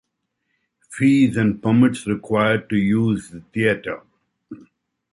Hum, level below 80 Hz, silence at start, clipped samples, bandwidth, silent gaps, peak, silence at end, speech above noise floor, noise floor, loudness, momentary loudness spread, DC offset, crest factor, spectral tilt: none; -54 dBFS; 0.9 s; under 0.1%; 11.5 kHz; none; -4 dBFS; 0.6 s; 56 dB; -75 dBFS; -19 LUFS; 13 LU; under 0.1%; 16 dB; -7 dB/octave